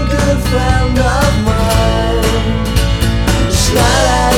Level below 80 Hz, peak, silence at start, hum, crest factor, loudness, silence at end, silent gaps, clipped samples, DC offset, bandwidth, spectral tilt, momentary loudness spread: -16 dBFS; 0 dBFS; 0 s; none; 12 dB; -13 LUFS; 0 s; none; under 0.1%; 0.4%; 17.5 kHz; -5 dB/octave; 4 LU